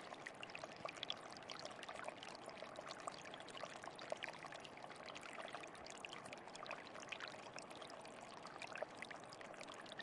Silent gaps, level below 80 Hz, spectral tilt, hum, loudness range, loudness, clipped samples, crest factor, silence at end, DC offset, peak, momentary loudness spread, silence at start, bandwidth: none; -86 dBFS; -2.5 dB/octave; none; 1 LU; -52 LUFS; under 0.1%; 24 dB; 0 s; under 0.1%; -28 dBFS; 5 LU; 0 s; 11.5 kHz